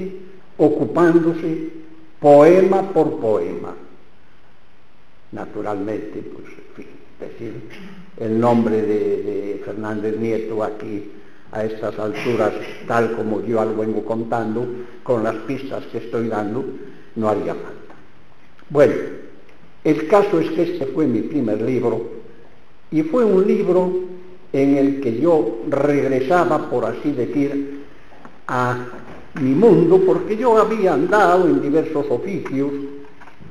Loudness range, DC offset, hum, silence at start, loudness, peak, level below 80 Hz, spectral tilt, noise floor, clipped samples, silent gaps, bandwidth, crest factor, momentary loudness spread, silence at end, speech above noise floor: 10 LU; 2%; none; 0 s; -18 LUFS; 0 dBFS; -58 dBFS; -8 dB/octave; -54 dBFS; under 0.1%; none; 11 kHz; 18 dB; 18 LU; 0.25 s; 36 dB